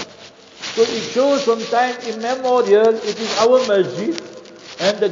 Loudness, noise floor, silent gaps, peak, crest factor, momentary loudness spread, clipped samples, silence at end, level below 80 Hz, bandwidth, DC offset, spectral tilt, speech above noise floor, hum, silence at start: -17 LUFS; -42 dBFS; none; -2 dBFS; 16 dB; 16 LU; under 0.1%; 0 s; -64 dBFS; 7.6 kHz; under 0.1%; -3.5 dB/octave; 25 dB; none; 0 s